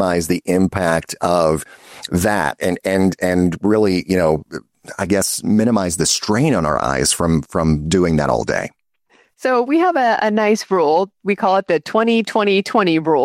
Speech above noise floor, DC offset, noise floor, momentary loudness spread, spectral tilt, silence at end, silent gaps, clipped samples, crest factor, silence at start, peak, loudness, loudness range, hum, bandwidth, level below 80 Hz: 40 dB; under 0.1%; -57 dBFS; 6 LU; -5 dB/octave; 0 s; none; under 0.1%; 14 dB; 0 s; -2 dBFS; -17 LUFS; 2 LU; none; 16 kHz; -42 dBFS